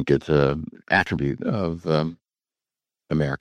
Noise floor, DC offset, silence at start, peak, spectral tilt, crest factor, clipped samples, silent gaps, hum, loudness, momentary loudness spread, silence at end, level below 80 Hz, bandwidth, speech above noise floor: under -90 dBFS; under 0.1%; 0 s; -4 dBFS; -7.5 dB/octave; 20 dB; under 0.1%; none; none; -23 LUFS; 7 LU; 0.05 s; -44 dBFS; 9.2 kHz; over 67 dB